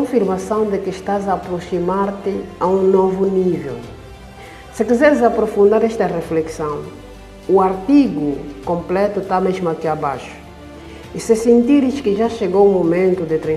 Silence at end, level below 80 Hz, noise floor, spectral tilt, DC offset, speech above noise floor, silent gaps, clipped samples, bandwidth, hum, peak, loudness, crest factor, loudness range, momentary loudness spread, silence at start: 0 s; -44 dBFS; -36 dBFS; -7 dB/octave; under 0.1%; 20 dB; none; under 0.1%; 13 kHz; none; 0 dBFS; -17 LUFS; 16 dB; 3 LU; 20 LU; 0 s